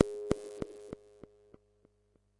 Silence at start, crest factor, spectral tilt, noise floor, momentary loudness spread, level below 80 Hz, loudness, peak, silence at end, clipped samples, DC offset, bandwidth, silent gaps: 0 s; 32 dB; -6.5 dB/octave; -72 dBFS; 23 LU; -60 dBFS; -38 LUFS; -6 dBFS; 1.45 s; under 0.1%; under 0.1%; 11.5 kHz; none